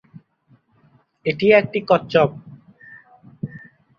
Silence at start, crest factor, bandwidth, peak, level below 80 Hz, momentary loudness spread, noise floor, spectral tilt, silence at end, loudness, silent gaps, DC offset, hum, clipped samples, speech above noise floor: 1.25 s; 20 dB; 6.8 kHz; -2 dBFS; -60 dBFS; 19 LU; -58 dBFS; -7.5 dB/octave; 0.4 s; -18 LUFS; none; under 0.1%; none; under 0.1%; 41 dB